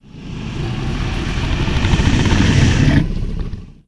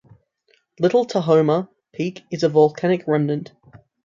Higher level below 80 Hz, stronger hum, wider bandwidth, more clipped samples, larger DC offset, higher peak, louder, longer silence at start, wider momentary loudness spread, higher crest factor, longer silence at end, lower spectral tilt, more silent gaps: first, -22 dBFS vs -64 dBFS; neither; first, 11 kHz vs 7.4 kHz; neither; neither; first, 0 dBFS vs -4 dBFS; first, -17 LUFS vs -20 LUFS; second, 0.15 s vs 0.8 s; first, 14 LU vs 11 LU; about the same, 16 dB vs 16 dB; second, 0.15 s vs 0.3 s; second, -6 dB/octave vs -7.5 dB/octave; neither